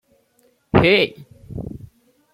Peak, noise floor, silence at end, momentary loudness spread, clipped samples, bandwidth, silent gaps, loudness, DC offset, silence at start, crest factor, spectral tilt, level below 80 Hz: -2 dBFS; -61 dBFS; 0.55 s; 21 LU; under 0.1%; 14.5 kHz; none; -17 LUFS; under 0.1%; 0.75 s; 20 dB; -7 dB/octave; -44 dBFS